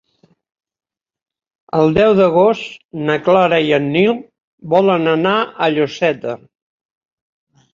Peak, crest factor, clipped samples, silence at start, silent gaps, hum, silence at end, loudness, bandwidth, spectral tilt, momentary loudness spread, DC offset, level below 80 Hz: -2 dBFS; 16 dB; under 0.1%; 1.75 s; 2.85-2.89 s, 4.40-4.58 s; none; 1.35 s; -15 LUFS; 7.4 kHz; -7 dB/octave; 12 LU; under 0.1%; -52 dBFS